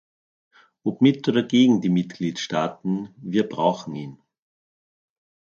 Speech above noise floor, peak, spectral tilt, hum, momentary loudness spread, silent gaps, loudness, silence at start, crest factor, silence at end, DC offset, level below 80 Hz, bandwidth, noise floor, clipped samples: over 68 dB; -4 dBFS; -6.5 dB/octave; none; 13 LU; none; -22 LUFS; 0.85 s; 20 dB; 1.45 s; under 0.1%; -68 dBFS; 7.2 kHz; under -90 dBFS; under 0.1%